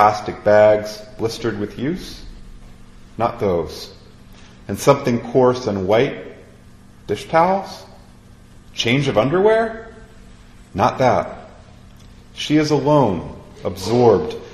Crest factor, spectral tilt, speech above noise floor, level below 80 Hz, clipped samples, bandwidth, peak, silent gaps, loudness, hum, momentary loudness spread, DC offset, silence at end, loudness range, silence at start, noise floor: 20 dB; -6 dB/octave; 27 dB; -44 dBFS; under 0.1%; 13 kHz; 0 dBFS; none; -18 LUFS; none; 20 LU; under 0.1%; 0 s; 5 LU; 0 s; -44 dBFS